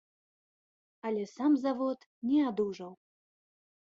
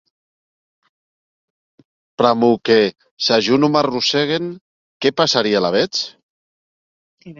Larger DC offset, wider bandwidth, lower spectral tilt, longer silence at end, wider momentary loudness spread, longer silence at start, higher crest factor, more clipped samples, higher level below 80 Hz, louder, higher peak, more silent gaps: neither; about the same, 7.4 kHz vs 7.6 kHz; first, -7 dB/octave vs -4.5 dB/octave; first, 1 s vs 0.05 s; first, 13 LU vs 9 LU; second, 1.05 s vs 2.2 s; about the same, 16 dB vs 18 dB; neither; second, -78 dBFS vs -60 dBFS; second, -32 LUFS vs -16 LUFS; second, -18 dBFS vs 0 dBFS; second, 2.06-2.22 s vs 3.11-3.17 s, 4.61-5.00 s, 6.23-7.18 s